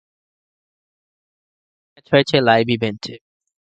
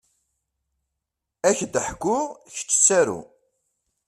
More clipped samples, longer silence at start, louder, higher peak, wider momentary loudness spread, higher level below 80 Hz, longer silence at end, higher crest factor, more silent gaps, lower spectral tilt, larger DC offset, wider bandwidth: neither; first, 2.1 s vs 1.45 s; first, -17 LUFS vs -21 LUFS; first, 0 dBFS vs -4 dBFS; about the same, 16 LU vs 14 LU; about the same, -58 dBFS vs -58 dBFS; second, 0.55 s vs 0.85 s; about the same, 22 dB vs 22 dB; neither; first, -6 dB/octave vs -2.5 dB/octave; neither; second, 8.8 kHz vs 14 kHz